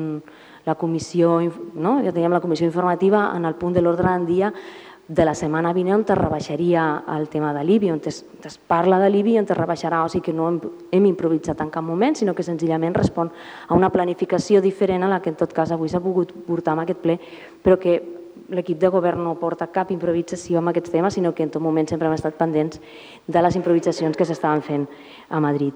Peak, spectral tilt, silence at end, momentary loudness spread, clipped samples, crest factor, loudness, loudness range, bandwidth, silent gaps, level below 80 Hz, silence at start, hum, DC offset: -4 dBFS; -7 dB/octave; 0 s; 9 LU; under 0.1%; 16 dB; -21 LUFS; 2 LU; 10 kHz; none; -52 dBFS; 0 s; none; under 0.1%